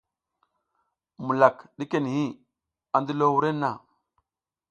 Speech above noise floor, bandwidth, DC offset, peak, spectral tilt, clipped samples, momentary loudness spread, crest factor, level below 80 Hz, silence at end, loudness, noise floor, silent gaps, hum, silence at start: 64 dB; 8.4 kHz; under 0.1%; -2 dBFS; -7.5 dB/octave; under 0.1%; 14 LU; 24 dB; -72 dBFS; 0.95 s; -25 LUFS; -88 dBFS; none; none; 1.2 s